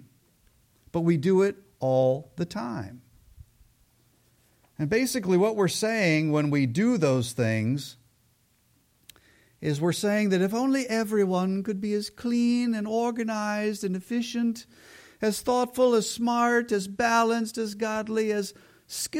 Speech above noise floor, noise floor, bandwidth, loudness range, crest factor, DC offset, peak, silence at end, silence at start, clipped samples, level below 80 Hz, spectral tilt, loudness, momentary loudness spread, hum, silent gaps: 41 dB; -66 dBFS; 16.5 kHz; 5 LU; 16 dB; under 0.1%; -10 dBFS; 0 s; 0.95 s; under 0.1%; -64 dBFS; -5.5 dB/octave; -26 LUFS; 9 LU; none; none